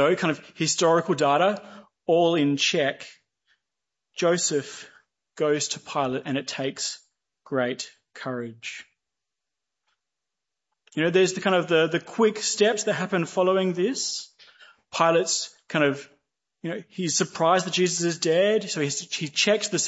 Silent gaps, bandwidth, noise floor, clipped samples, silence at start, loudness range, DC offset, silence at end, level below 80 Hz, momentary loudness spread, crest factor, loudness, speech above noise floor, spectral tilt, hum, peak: none; 8.2 kHz; -87 dBFS; under 0.1%; 0 s; 9 LU; under 0.1%; 0 s; -74 dBFS; 14 LU; 20 dB; -24 LUFS; 63 dB; -3.5 dB/octave; none; -6 dBFS